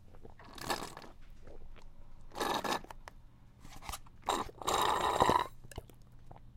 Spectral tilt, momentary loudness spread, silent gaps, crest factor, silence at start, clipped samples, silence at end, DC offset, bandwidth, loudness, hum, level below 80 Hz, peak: -3 dB/octave; 26 LU; none; 28 dB; 0 s; under 0.1%; 0 s; under 0.1%; 16.5 kHz; -35 LUFS; none; -52 dBFS; -10 dBFS